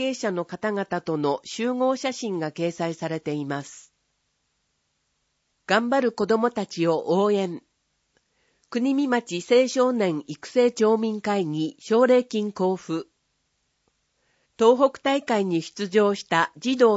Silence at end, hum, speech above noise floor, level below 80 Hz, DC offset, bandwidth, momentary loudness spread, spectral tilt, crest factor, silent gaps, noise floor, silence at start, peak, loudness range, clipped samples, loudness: 0 s; none; 51 dB; -74 dBFS; under 0.1%; 8 kHz; 9 LU; -5 dB/octave; 18 dB; none; -73 dBFS; 0 s; -6 dBFS; 6 LU; under 0.1%; -24 LUFS